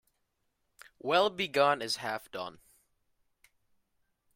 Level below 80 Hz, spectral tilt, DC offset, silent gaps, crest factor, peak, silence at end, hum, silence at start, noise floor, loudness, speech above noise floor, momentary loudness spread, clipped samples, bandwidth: -76 dBFS; -3 dB/octave; under 0.1%; none; 22 dB; -12 dBFS; 1.85 s; none; 1.05 s; -79 dBFS; -30 LUFS; 49 dB; 14 LU; under 0.1%; 16 kHz